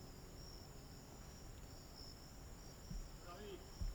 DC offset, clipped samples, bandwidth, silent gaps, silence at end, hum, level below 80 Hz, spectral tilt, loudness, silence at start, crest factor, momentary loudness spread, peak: under 0.1%; under 0.1%; over 20 kHz; none; 0 s; none; -56 dBFS; -4.5 dB/octave; -56 LUFS; 0 s; 18 dB; 3 LU; -34 dBFS